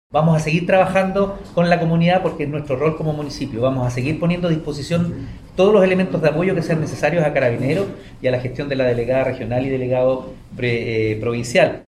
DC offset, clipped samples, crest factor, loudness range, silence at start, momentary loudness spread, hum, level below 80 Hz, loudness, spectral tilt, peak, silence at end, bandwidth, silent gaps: under 0.1%; under 0.1%; 16 dB; 3 LU; 0.1 s; 8 LU; none; -42 dBFS; -19 LUFS; -7 dB/octave; -2 dBFS; 0.1 s; 12 kHz; none